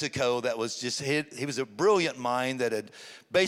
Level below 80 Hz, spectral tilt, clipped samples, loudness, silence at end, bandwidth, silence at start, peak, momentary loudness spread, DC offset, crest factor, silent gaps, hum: -72 dBFS; -4 dB/octave; under 0.1%; -29 LUFS; 0 s; 15.5 kHz; 0 s; -10 dBFS; 9 LU; under 0.1%; 18 dB; none; none